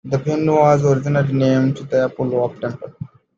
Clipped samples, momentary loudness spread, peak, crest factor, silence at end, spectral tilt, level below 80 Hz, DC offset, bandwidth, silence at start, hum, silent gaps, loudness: under 0.1%; 14 LU; -2 dBFS; 16 dB; 0.3 s; -8 dB/octave; -54 dBFS; under 0.1%; 7.4 kHz; 0.05 s; none; none; -17 LUFS